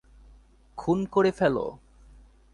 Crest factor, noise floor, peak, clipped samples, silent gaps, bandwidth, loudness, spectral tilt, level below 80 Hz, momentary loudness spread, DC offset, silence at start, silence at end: 18 dB; -55 dBFS; -10 dBFS; under 0.1%; none; 10.5 kHz; -26 LUFS; -7.5 dB/octave; -54 dBFS; 13 LU; under 0.1%; 0.75 s; 0.8 s